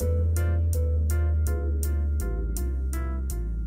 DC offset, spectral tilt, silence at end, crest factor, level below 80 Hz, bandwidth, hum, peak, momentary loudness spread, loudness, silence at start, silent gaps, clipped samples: under 0.1%; -7 dB/octave; 0 s; 12 dB; -26 dBFS; 16 kHz; none; -12 dBFS; 5 LU; -27 LUFS; 0 s; none; under 0.1%